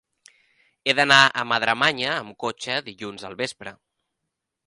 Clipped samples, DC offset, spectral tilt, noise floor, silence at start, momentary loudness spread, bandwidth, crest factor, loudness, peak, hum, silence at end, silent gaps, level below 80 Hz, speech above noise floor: under 0.1%; under 0.1%; -2.5 dB/octave; -82 dBFS; 0.85 s; 20 LU; 11.5 kHz; 24 dB; -21 LUFS; 0 dBFS; none; 0.95 s; none; -66 dBFS; 59 dB